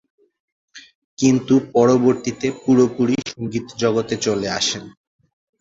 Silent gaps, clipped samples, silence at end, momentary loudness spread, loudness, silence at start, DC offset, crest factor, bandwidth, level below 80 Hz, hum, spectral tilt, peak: 0.95-1.17 s; under 0.1%; 0.7 s; 9 LU; -19 LUFS; 0.75 s; under 0.1%; 18 dB; 7.8 kHz; -56 dBFS; none; -5 dB/octave; -2 dBFS